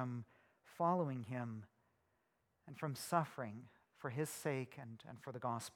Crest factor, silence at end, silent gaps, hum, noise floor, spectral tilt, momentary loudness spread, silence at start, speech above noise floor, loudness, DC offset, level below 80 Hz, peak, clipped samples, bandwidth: 22 dB; 0.05 s; none; none; -82 dBFS; -6 dB/octave; 16 LU; 0 s; 40 dB; -43 LUFS; under 0.1%; -86 dBFS; -22 dBFS; under 0.1%; 19 kHz